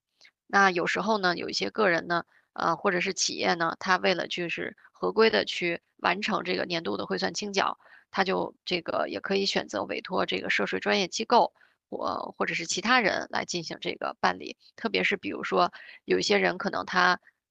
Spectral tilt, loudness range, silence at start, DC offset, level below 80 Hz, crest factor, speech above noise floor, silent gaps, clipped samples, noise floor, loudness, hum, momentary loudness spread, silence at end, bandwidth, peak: -3.5 dB/octave; 3 LU; 0.5 s; under 0.1%; -70 dBFS; 22 dB; 34 dB; none; under 0.1%; -62 dBFS; -27 LUFS; none; 9 LU; 0.35 s; 9 kHz; -6 dBFS